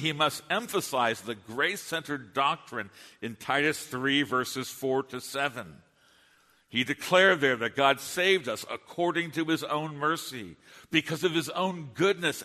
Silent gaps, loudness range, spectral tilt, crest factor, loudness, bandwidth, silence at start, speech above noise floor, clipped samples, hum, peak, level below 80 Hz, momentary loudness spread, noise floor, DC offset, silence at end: none; 4 LU; -3.5 dB/octave; 22 dB; -28 LUFS; 13.5 kHz; 0 s; 35 dB; under 0.1%; none; -8 dBFS; -72 dBFS; 13 LU; -64 dBFS; under 0.1%; 0 s